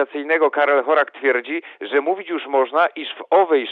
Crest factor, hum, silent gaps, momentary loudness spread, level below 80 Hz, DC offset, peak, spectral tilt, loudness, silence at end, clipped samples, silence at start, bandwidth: 16 dB; none; none; 8 LU; under -90 dBFS; under 0.1%; -4 dBFS; -5 dB/octave; -19 LUFS; 0 s; under 0.1%; 0 s; 4.8 kHz